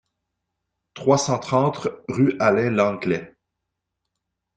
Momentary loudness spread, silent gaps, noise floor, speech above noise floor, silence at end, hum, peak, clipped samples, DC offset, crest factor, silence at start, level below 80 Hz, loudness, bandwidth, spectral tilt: 8 LU; none; -81 dBFS; 61 dB; 1.3 s; none; -2 dBFS; under 0.1%; under 0.1%; 20 dB; 0.95 s; -60 dBFS; -21 LUFS; 9.4 kHz; -5.5 dB/octave